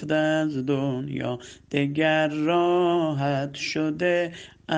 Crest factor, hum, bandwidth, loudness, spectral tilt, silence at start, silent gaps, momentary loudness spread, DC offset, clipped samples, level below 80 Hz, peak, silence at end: 18 dB; none; 9.4 kHz; -24 LUFS; -6 dB/octave; 0 s; none; 9 LU; under 0.1%; under 0.1%; -62 dBFS; -6 dBFS; 0 s